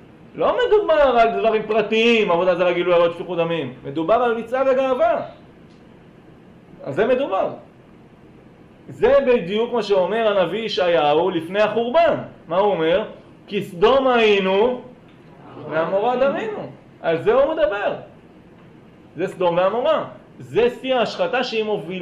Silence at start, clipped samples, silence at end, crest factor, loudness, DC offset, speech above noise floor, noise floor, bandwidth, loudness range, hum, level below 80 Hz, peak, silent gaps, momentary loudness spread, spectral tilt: 0.35 s; under 0.1%; 0 s; 14 dB; -19 LUFS; under 0.1%; 28 dB; -47 dBFS; 10.5 kHz; 5 LU; none; -52 dBFS; -6 dBFS; none; 12 LU; -6 dB/octave